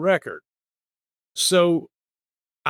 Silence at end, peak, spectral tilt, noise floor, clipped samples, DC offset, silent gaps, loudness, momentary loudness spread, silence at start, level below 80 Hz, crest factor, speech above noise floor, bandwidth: 0 s; -6 dBFS; -3.5 dB/octave; under -90 dBFS; under 0.1%; under 0.1%; none; -20 LUFS; 19 LU; 0 s; -76 dBFS; 18 dB; over 69 dB; 17 kHz